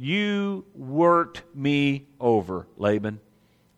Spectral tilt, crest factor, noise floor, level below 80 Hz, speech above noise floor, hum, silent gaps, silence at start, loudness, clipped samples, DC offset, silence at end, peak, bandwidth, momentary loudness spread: -7 dB/octave; 18 dB; -61 dBFS; -62 dBFS; 37 dB; none; none; 0 s; -24 LUFS; under 0.1%; under 0.1%; 0.6 s; -8 dBFS; 10 kHz; 14 LU